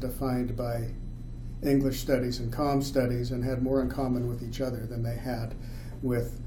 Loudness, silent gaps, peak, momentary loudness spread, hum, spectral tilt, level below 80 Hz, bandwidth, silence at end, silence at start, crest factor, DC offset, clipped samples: -30 LUFS; none; -12 dBFS; 12 LU; none; -7 dB/octave; -40 dBFS; 18.5 kHz; 0 s; 0 s; 16 dB; under 0.1%; under 0.1%